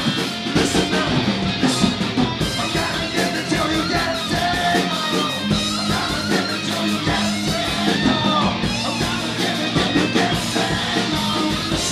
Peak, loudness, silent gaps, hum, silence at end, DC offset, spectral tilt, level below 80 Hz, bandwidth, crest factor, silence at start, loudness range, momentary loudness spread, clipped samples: -2 dBFS; -19 LUFS; none; none; 0 s; under 0.1%; -4 dB/octave; -40 dBFS; 15.5 kHz; 18 dB; 0 s; 1 LU; 3 LU; under 0.1%